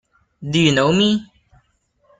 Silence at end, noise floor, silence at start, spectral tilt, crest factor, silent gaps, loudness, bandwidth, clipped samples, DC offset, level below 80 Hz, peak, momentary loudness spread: 0.95 s; -63 dBFS; 0.4 s; -5 dB/octave; 16 dB; none; -17 LUFS; 9.4 kHz; under 0.1%; under 0.1%; -54 dBFS; -2 dBFS; 9 LU